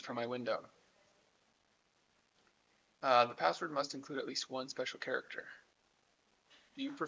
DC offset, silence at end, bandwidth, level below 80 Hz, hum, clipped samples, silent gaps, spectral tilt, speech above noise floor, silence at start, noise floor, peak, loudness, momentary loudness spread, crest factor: under 0.1%; 0 s; 8 kHz; -88 dBFS; none; under 0.1%; none; -3.5 dB/octave; 38 dB; 0 s; -76 dBFS; -16 dBFS; -37 LUFS; 16 LU; 24 dB